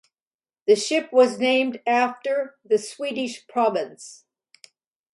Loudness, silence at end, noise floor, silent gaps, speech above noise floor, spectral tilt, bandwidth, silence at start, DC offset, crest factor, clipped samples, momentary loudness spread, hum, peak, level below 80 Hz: -22 LUFS; 1 s; under -90 dBFS; none; over 68 dB; -3 dB/octave; 11.5 kHz; 0.65 s; under 0.1%; 18 dB; under 0.1%; 11 LU; none; -6 dBFS; -78 dBFS